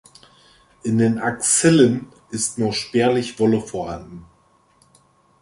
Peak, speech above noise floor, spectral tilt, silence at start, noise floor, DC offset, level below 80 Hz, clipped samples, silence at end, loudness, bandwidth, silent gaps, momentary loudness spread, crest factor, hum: -2 dBFS; 39 dB; -4.5 dB/octave; 0.85 s; -58 dBFS; under 0.1%; -54 dBFS; under 0.1%; 1.15 s; -19 LUFS; 11.5 kHz; none; 16 LU; 18 dB; none